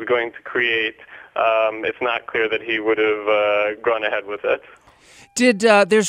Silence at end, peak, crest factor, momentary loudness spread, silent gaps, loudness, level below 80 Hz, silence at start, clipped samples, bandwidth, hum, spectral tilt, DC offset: 0 s; -2 dBFS; 18 dB; 8 LU; none; -19 LUFS; -62 dBFS; 0 s; under 0.1%; 15 kHz; none; -3.5 dB/octave; under 0.1%